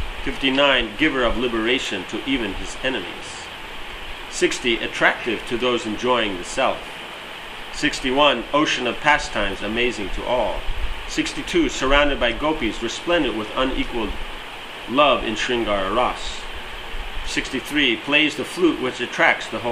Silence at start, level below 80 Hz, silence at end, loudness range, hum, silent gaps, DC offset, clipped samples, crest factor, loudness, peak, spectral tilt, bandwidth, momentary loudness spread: 0 s; -34 dBFS; 0 s; 3 LU; none; none; under 0.1%; under 0.1%; 22 dB; -21 LUFS; 0 dBFS; -3.5 dB/octave; 15.5 kHz; 15 LU